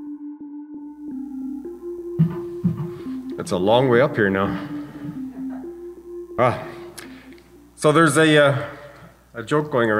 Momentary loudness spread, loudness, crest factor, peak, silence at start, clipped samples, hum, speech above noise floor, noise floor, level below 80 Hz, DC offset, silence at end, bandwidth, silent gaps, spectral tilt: 21 LU; -21 LUFS; 18 dB; -4 dBFS; 0 s; under 0.1%; none; 28 dB; -46 dBFS; -56 dBFS; under 0.1%; 0 s; 15.5 kHz; none; -5.5 dB/octave